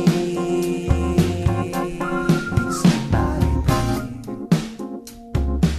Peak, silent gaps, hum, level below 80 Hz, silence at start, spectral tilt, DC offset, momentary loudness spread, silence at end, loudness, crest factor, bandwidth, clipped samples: -4 dBFS; none; none; -28 dBFS; 0 s; -6.5 dB/octave; under 0.1%; 12 LU; 0 s; -21 LUFS; 16 dB; 14 kHz; under 0.1%